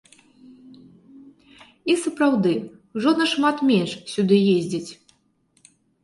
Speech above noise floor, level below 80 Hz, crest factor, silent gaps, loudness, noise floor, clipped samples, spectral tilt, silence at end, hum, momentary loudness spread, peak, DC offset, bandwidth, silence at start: 44 dB; -68 dBFS; 18 dB; none; -21 LUFS; -64 dBFS; under 0.1%; -5.5 dB/octave; 1.1 s; none; 12 LU; -6 dBFS; under 0.1%; 11.5 kHz; 0.5 s